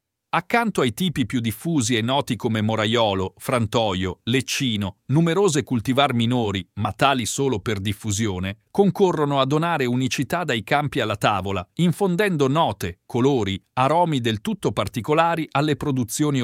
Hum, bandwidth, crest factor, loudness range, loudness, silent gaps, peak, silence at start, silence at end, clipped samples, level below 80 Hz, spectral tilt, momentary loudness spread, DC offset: none; 16.5 kHz; 20 dB; 1 LU; -22 LUFS; none; -2 dBFS; 0.35 s; 0 s; under 0.1%; -52 dBFS; -5 dB/octave; 6 LU; under 0.1%